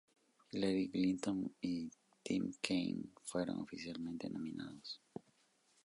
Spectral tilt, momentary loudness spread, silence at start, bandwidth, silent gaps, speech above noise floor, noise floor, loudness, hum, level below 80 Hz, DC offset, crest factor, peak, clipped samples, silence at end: -5.5 dB/octave; 13 LU; 0.5 s; 11.5 kHz; none; 35 dB; -75 dBFS; -41 LUFS; none; -74 dBFS; under 0.1%; 24 dB; -18 dBFS; under 0.1%; 0.65 s